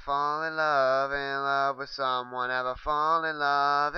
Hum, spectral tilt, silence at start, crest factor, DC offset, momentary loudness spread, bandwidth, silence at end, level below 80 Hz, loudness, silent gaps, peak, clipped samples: none; -4.5 dB/octave; 0 s; 16 dB; under 0.1%; 6 LU; 6.8 kHz; 0 s; -54 dBFS; -27 LUFS; none; -12 dBFS; under 0.1%